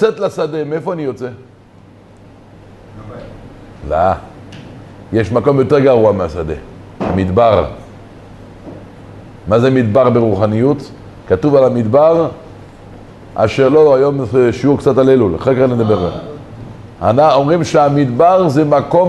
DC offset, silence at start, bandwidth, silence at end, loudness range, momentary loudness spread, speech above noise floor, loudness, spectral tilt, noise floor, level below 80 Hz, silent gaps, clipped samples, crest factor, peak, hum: under 0.1%; 0 s; 11.5 kHz; 0 s; 11 LU; 22 LU; 30 dB; -12 LUFS; -8 dB/octave; -41 dBFS; -38 dBFS; none; under 0.1%; 12 dB; 0 dBFS; none